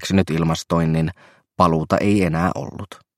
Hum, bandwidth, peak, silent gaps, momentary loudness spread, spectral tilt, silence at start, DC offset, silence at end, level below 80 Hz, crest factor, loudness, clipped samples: none; 14 kHz; 0 dBFS; none; 11 LU; -6.5 dB/octave; 0 s; under 0.1%; 0.25 s; -42 dBFS; 20 dB; -20 LUFS; under 0.1%